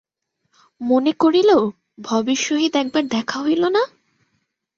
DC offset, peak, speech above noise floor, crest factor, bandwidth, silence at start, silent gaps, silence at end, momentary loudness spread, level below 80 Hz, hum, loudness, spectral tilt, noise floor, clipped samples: under 0.1%; -4 dBFS; 55 dB; 16 dB; 7.4 kHz; 0.8 s; none; 0.9 s; 10 LU; -64 dBFS; none; -19 LUFS; -3.5 dB/octave; -72 dBFS; under 0.1%